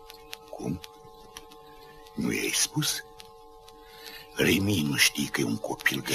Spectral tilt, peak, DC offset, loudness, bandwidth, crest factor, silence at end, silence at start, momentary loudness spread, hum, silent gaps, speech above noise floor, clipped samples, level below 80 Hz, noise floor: -3 dB/octave; -8 dBFS; under 0.1%; -26 LUFS; 15.5 kHz; 22 dB; 0 s; 0 s; 24 LU; none; none; 23 dB; under 0.1%; -56 dBFS; -50 dBFS